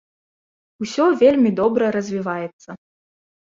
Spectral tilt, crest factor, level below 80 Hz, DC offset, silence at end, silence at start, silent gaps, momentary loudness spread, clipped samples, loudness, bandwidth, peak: -6 dB/octave; 18 dB; -60 dBFS; under 0.1%; 0.75 s; 0.8 s; 2.53-2.59 s; 14 LU; under 0.1%; -18 LUFS; 7.8 kHz; -4 dBFS